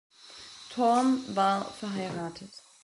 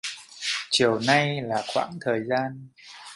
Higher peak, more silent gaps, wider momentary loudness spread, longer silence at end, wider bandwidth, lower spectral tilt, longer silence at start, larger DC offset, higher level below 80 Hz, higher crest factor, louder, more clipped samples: second, -14 dBFS vs -4 dBFS; neither; first, 21 LU vs 16 LU; first, 0.25 s vs 0 s; about the same, 11.5 kHz vs 11.5 kHz; about the same, -5 dB/octave vs -4 dB/octave; first, 0.25 s vs 0.05 s; neither; about the same, -70 dBFS vs -66 dBFS; second, 16 dB vs 22 dB; second, -29 LUFS vs -25 LUFS; neither